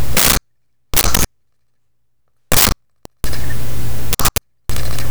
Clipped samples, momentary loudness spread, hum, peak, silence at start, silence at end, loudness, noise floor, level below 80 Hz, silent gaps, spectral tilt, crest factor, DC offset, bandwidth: under 0.1%; 14 LU; none; 0 dBFS; 0 s; 0 s; -16 LUFS; -72 dBFS; -26 dBFS; none; -2.5 dB/octave; 16 dB; 10%; over 20 kHz